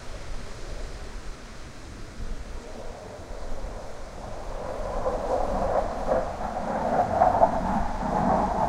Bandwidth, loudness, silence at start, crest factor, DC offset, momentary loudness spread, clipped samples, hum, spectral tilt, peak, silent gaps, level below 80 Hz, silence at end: 12 kHz; -27 LUFS; 0 s; 22 dB; under 0.1%; 18 LU; under 0.1%; none; -6.5 dB/octave; -6 dBFS; none; -36 dBFS; 0 s